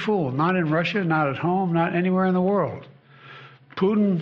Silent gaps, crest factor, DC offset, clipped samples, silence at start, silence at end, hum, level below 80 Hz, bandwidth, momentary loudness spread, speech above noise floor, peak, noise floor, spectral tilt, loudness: none; 12 dB; under 0.1%; under 0.1%; 0 s; 0 s; none; -62 dBFS; 6.4 kHz; 4 LU; 24 dB; -10 dBFS; -46 dBFS; -6 dB/octave; -22 LUFS